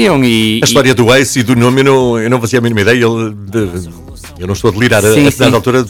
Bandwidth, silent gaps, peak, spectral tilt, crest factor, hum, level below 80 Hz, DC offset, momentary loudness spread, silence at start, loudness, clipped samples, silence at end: 19.5 kHz; none; 0 dBFS; -5 dB/octave; 10 dB; none; -36 dBFS; under 0.1%; 10 LU; 0 s; -10 LUFS; under 0.1%; 0 s